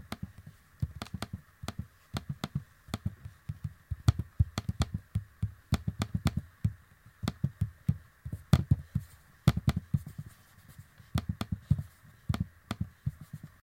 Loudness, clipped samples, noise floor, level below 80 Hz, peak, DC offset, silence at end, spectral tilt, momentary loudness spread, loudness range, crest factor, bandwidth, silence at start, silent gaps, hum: -35 LUFS; under 0.1%; -57 dBFS; -46 dBFS; -8 dBFS; under 0.1%; 0.15 s; -6.5 dB/octave; 18 LU; 6 LU; 28 dB; 16.5 kHz; 0 s; none; none